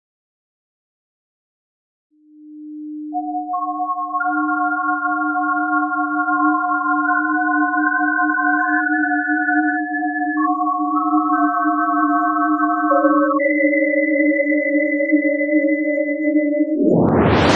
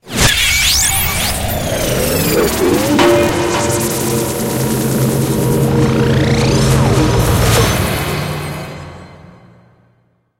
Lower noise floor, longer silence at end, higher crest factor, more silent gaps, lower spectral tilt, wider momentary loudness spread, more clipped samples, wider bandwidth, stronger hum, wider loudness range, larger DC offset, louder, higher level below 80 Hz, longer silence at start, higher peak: second, -41 dBFS vs -57 dBFS; second, 0 s vs 1.25 s; about the same, 16 dB vs 14 dB; neither; first, -7 dB/octave vs -4 dB/octave; about the same, 6 LU vs 8 LU; neither; second, 7 kHz vs 17 kHz; neither; first, 8 LU vs 3 LU; neither; second, -17 LUFS vs -13 LUFS; second, -50 dBFS vs -26 dBFS; first, 2.4 s vs 0.05 s; about the same, -2 dBFS vs 0 dBFS